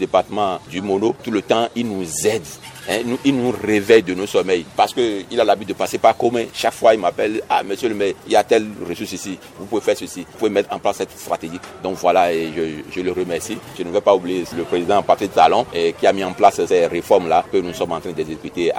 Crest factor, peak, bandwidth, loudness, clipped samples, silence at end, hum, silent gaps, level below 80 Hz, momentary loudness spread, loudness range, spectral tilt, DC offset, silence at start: 18 dB; 0 dBFS; 17 kHz; -19 LUFS; under 0.1%; 0 s; none; none; -54 dBFS; 11 LU; 4 LU; -4.5 dB/octave; under 0.1%; 0 s